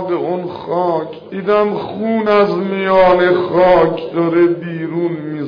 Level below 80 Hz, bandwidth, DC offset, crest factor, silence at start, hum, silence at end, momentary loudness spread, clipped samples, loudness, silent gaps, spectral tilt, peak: -46 dBFS; 5.2 kHz; under 0.1%; 12 dB; 0 s; none; 0 s; 11 LU; under 0.1%; -15 LUFS; none; -8.5 dB/octave; -2 dBFS